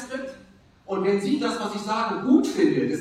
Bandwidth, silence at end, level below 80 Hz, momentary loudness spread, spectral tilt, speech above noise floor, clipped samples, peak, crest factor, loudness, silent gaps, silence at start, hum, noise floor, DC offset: 13 kHz; 0 s; -64 dBFS; 13 LU; -5.5 dB/octave; 30 dB; under 0.1%; -6 dBFS; 18 dB; -24 LUFS; none; 0 s; none; -52 dBFS; under 0.1%